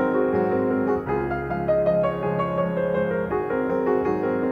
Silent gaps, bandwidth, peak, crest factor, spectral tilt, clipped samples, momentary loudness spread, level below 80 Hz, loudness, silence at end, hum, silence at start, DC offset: none; 6.6 kHz; -8 dBFS; 14 dB; -9.5 dB/octave; under 0.1%; 4 LU; -46 dBFS; -23 LUFS; 0 s; none; 0 s; under 0.1%